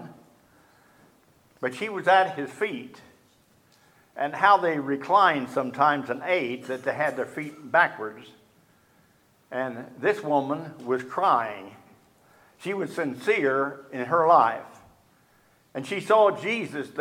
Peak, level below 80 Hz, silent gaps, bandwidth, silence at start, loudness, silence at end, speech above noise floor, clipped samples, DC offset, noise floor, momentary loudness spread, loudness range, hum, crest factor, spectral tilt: -4 dBFS; -76 dBFS; none; 16 kHz; 0 s; -25 LUFS; 0 s; 37 dB; under 0.1%; under 0.1%; -62 dBFS; 15 LU; 5 LU; none; 22 dB; -5.5 dB/octave